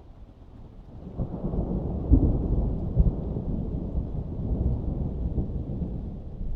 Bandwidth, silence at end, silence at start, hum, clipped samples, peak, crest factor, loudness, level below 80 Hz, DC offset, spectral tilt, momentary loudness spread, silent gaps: 1.7 kHz; 0 s; 0 s; none; under 0.1%; -6 dBFS; 22 dB; -29 LUFS; -30 dBFS; under 0.1%; -13 dB/octave; 17 LU; none